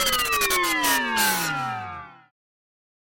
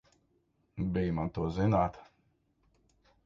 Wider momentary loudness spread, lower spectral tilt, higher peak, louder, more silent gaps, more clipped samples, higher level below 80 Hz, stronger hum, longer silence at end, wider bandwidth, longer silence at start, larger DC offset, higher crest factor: first, 13 LU vs 8 LU; second, -1 dB/octave vs -9 dB/octave; first, -8 dBFS vs -16 dBFS; first, -21 LUFS vs -32 LUFS; neither; neither; about the same, -50 dBFS vs -50 dBFS; neither; second, 0.85 s vs 1.2 s; first, 17 kHz vs 7.2 kHz; second, 0 s vs 0.75 s; neither; about the same, 18 dB vs 20 dB